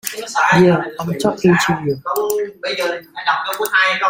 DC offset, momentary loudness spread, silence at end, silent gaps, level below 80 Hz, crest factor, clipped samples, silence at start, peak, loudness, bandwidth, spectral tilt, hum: under 0.1%; 10 LU; 0 s; none; -54 dBFS; 16 dB; under 0.1%; 0.05 s; -2 dBFS; -17 LUFS; 16.5 kHz; -5 dB/octave; none